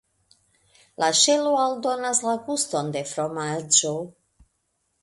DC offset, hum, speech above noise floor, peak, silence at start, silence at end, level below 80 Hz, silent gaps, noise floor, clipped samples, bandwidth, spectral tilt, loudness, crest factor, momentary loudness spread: under 0.1%; none; 50 dB; -4 dBFS; 1 s; 0.95 s; -68 dBFS; none; -73 dBFS; under 0.1%; 12 kHz; -2 dB/octave; -22 LUFS; 22 dB; 11 LU